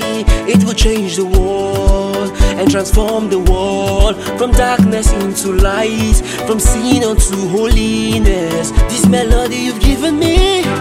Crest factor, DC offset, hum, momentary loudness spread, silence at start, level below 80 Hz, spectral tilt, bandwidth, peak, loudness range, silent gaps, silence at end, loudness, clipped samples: 12 dB; 0.3%; none; 4 LU; 0 s; -16 dBFS; -5 dB/octave; 16 kHz; 0 dBFS; 1 LU; none; 0 s; -13 LUFS; under 0.1%